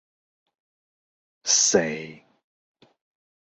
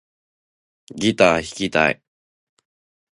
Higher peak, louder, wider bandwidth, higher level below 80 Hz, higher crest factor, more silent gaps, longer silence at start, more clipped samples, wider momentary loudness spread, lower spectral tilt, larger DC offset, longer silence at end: second, -6 dBFS vs 0 dBFS; about the same, -21 LUFS vs -19 LUFS; second, 8.4 kHz vs 11.5 kHz; second, -68 dBFS vs -52 dBFS; about the same, 24 dB vs 22 dB; neither; first, 1.45 s vs 0.95 s; neither; first, 18 LU vs 14 LU; second, -1.5 dB/octave vs -4.5 dB/octave; neither; about the same, 1.35 s vs 1.25 s